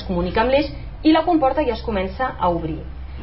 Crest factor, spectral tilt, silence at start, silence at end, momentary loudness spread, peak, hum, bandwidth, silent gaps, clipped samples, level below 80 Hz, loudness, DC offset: 14 dB; -11 dB/octave; 0 s; 0 s; 12 LU; -6 dBFS; none; 5.8 kHz; none; under 0.1%; -32 dBFS; -20 LUFS; 0.9%